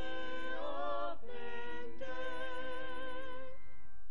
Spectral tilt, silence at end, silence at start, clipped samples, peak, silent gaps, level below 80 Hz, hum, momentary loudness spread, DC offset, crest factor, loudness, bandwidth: -5.5 dB/octave; 0 s; 0 s; under 0.1%; -24 dBFS; none; -64 dBFS; none; 12 LU; 3%; 16 dB; -44 LUFS; 11 kHz